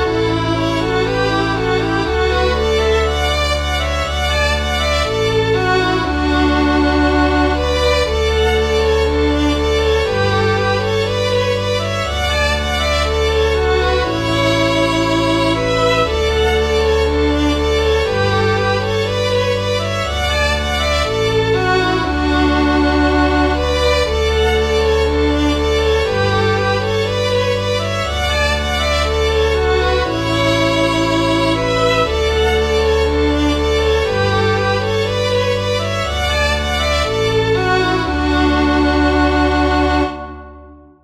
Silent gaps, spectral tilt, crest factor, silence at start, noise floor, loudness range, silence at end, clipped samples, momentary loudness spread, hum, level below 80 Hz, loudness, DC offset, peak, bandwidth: none; -5 dB/octave; 12 dB; 0 s; -39 dBFS; 1 LU; 0.3 s; under 0.1%; 3 LU; none; -24 dBFS; -15 LUFS; under 0.1%; -2 dBFS; 13.5 kHz